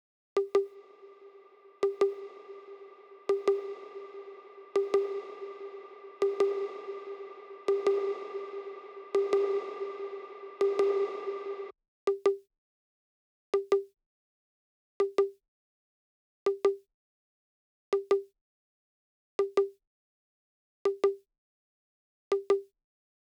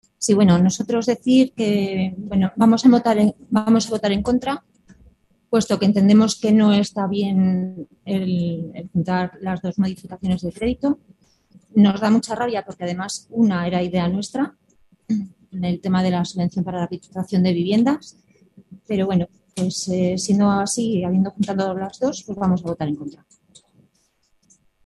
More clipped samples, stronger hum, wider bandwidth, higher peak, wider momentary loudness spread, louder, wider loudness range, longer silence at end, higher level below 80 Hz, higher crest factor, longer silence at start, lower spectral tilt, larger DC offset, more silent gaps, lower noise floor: neither; neither; second, 8.8 kHz vs 12 kHz; second, -16 dBFS vs -2 dBFS; first, 17 LU vs 11 LU; second, -32 LUFS vs -20 LUFS; second, 3 LU vs 6 LU; second, 0.75 s vs 1.75 s; second, -88 dBFS vs -50 dBFS; about the same, 18 dB vs 18 dB; first, 0.35 s vs 0.2 s; second, -4.5 dB/octave vs -6 dB/octave; neither; first, 11.88-12.07 s, 12.58-13.53 s, 14.06-15.00 s, 15.48-16.46 s, 16.94-17.92 s, 18.41-19.39 s, 19.87-20.85 s, 21.38-22.31 s vs none; second, -56 dBFS vs -64 dBFS